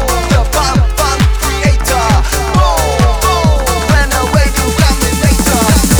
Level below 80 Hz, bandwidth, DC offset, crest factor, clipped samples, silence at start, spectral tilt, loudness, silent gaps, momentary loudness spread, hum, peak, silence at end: -14 dBFS; over 20 kHz; under 0.1%; 10 dB; under 0.1%; 0 s; -4.5 dB/octave; -11 LUFS; none; 2 LU; none; 0 dBFS; 0 s